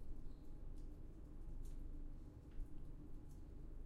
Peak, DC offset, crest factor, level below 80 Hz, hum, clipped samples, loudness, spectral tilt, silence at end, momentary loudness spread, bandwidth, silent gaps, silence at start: -38 dBFS; under 0.1%; 12 dB; -52 dBFS; none; under 0.1%; -58 LUFS; -8 dB/octave; 0 s; 3 LU; 7.2 kHz; none; 0 s